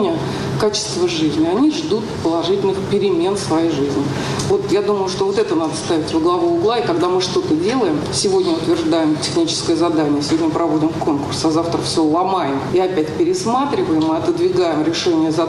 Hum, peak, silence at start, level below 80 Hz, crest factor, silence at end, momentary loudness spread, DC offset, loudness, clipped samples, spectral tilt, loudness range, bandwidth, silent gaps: none; -6 dBFS; 0 s; -48 dBFS; 10 dB; 0 s; 3 LU; under 0.1%; -17 LUFS; under 0.1%; -5 dB/octave; 1 LU; 12 kHz; none